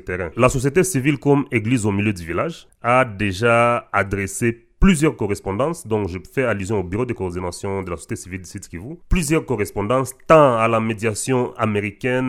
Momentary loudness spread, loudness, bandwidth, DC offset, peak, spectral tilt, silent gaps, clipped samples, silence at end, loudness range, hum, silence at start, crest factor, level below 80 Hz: 11 LU; -20 LUFS; 16 kHz; under 0.1%; 0 dBFS; -5.5 dB/octave; none; under 0.1%; 0 s; 6 LU; none; 0.05 s; 20 dB; -34 dBFS